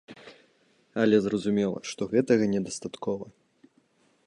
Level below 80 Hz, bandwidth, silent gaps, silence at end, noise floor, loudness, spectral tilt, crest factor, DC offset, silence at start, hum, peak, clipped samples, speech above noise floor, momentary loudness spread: -66 dBFS; 11 kHz; none; 1 s; -66 dBFS; -27 LUFS; -6 dB/octave; 20 dB; under 0.1%; 0.1 s; none; -8 dBFS; under 0.1%; 40 dB; 16 LU